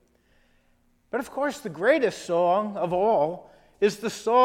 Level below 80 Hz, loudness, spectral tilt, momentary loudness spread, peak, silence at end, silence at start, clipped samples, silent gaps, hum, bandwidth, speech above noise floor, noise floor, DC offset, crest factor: -64 dBFS; -25 LUFS; -5 dB/octave; 9 LU; -8 dBFS; 0 s; 1.15 s; under 0.1%; none; none; 16 kHz; 41 dB; -64 dBFS; under 0.1%; 18 dB